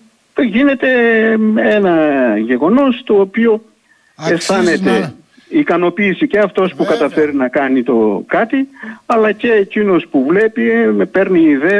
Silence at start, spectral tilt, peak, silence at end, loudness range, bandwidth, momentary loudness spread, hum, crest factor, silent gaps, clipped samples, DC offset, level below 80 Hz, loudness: 0.35 s; -6 dB/octave; -2 dBFS; 0 s; 3 LU; 11 kHz; 6 LU; none; 10 dB; none; under 0.1%; under 0.1%; -54 dBFS; -13 LUFS